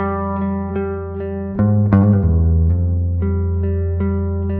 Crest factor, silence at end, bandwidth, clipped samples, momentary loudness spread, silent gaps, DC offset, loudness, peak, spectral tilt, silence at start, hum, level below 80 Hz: 16 dB; 0 s; 2.7 kHz; under 0.1%; 10 LU; none; under 0.1%; -18 LUFS; 0 dBFS; -13.5 dB/octave; 0 s; none; -26 dBFS